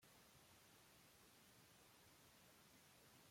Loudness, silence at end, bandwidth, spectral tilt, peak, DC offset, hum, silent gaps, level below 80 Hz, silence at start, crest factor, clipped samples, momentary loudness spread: -69 LUFS; 0 s; 16.5 kHz; -2.5 dB/octave; -56 dBFS; under 0.1%; none; none; -88 dBFS; 0 s; 14 dB; under 0.1%; 0 LU